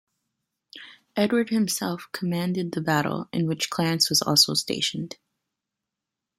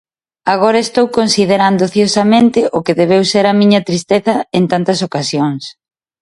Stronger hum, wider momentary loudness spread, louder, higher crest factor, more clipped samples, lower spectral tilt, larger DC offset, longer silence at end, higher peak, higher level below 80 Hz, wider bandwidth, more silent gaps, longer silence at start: neither; first, 17 LU vs 7 LU; second, -24 LUFS vs -12 LUFS; first, 22 dB vs 12 dB; neither; second, -3.5 dB/octave vs -5 dB/octave; neither; first, 1.25 s vs 0.5 s; second, -6 dBFS vs 0 dBFS; second, -66 dBFS vs -54 dBFS; first, 16 kHz vs 11.5 kHz; neither; first, 0.75 s vs 0.45 s